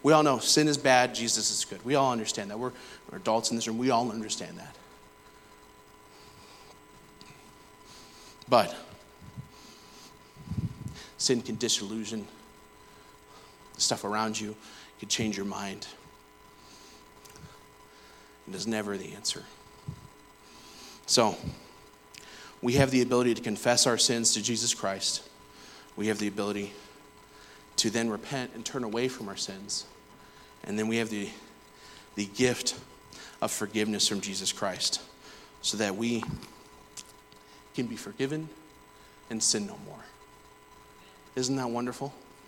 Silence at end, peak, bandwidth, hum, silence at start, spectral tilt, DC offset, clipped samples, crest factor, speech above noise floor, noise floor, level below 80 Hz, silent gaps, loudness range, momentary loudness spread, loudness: 0.25 s; -6 dBFS; 18.5 kHz; none; 0 s; -3 dB/octave; under 0.1%; under 0.1%; 26 dB; 26 dB; -55 dBFS; -62 dBFS; none; 11 LU; 25 LU; -29 LUFS